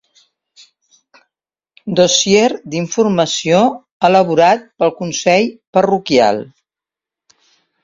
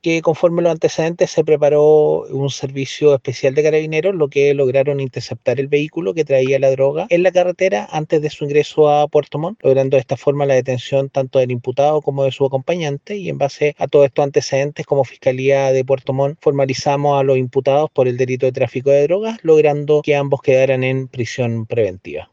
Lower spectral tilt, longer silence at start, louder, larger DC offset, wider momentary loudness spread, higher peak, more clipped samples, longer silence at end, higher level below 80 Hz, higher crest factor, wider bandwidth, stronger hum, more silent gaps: second, -4 dB/octave vs -6 dB/octave; first, 1.85 s vs 0.05 s; about the same, -14 LUFS vs -16 LUFS; neither; about the same, 8 LU vs 7 LU; about the same, 0 dBFS vs -2 dBFS; neither; first, 1.4 s vs 0.1 s; about the same, -56 dBFS vs -60 dBFS; about the same, 16 dB vs 14 dB; about the same, 7.8 kHz vs 7.6 kHz; neither; first, 3.91-4.00 s, 5.67-5.73 s vs none